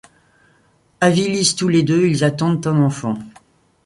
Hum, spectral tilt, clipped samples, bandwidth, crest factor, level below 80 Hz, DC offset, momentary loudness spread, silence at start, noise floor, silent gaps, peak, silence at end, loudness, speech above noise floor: none; -5 dB/octave; under 0.1%; 11.5 kHz; 16 dB; -56 dBFS; under 0.1%; 8 LU; 1 s; -57 dBFS; none; -2 dBFS; 0.55 s; -17 LUFS; 41 dB